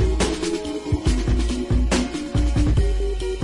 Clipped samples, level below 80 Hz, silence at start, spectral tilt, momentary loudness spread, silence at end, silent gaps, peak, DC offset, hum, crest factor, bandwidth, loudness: under 0.1%; -22 dBFS; 0 s; -6 dB/octave; 5 LU; 0 s; none; -8 dBFS; under 0.1%; none; 12 dB; 11.5 kHz; -23 LUFS